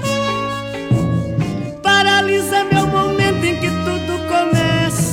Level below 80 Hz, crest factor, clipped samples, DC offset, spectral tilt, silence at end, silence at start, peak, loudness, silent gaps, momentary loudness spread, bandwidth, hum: -38 dBFS; 14 dB; under 0.1%; under 0.1%; -5 dB/octave; 0 s; 0 s; -2 dBFS; -16 LUFS; none; 8 LU; 17 kHz; none